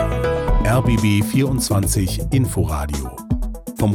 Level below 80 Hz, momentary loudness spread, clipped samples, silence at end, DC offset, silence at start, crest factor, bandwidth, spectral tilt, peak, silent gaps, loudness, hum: -26 dBFS; 8 LU; under 0.1%; 0 s; under 0.1%; 0 s; 12 dB; 18 kHz; -6 dB/octave; -6 dBFS; none; -19 LUFS; none